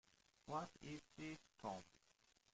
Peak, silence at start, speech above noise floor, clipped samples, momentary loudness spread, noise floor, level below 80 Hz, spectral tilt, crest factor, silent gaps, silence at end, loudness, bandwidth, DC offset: -34 dBFS; 0.45 s; 26 dB; under 0.1%; 9 LU; -78 dBFS; -78 dBFS; -5 dB/octave; 20 dB; none; 0.65 s; -53 LUFS; 9 kHz; under 0.1%